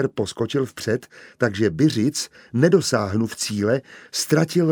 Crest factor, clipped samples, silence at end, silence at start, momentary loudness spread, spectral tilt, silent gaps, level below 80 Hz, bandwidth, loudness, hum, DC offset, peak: 18 dB; under 0.1%; 0 s; 0 s; 8 LU; -5 dB/octave; none; -58 dBFS; over 20 kHz; -22 LUFS; none; under 0.1%; -2 dBFS